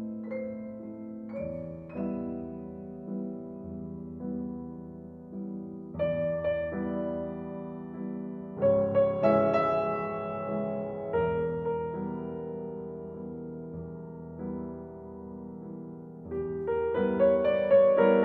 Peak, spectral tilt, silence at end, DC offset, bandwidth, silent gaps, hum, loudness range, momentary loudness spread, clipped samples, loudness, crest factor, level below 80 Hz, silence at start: -12 dBFS; -10 dB/octave; 0 s; under 0.1%; 4.3 kHz; none; none; 11 LU; 18 LU; under 0.1%; -31 LUFS; 20 dB; -58 dBFS; 0 s